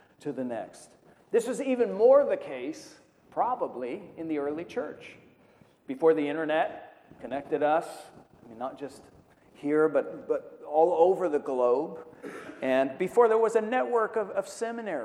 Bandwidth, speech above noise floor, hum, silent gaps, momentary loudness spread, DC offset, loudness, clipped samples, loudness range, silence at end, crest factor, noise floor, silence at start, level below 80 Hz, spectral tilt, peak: 12.5 kHz; 33 dB; none; none; 19 LU; under 0.1%; -28 LUFS; under 0.1%; 6 LU; 0 s; 20 dB; -60 dBFS; 0.25 s; -74 dBFS; -5.5 dB/octave; -10 dBFS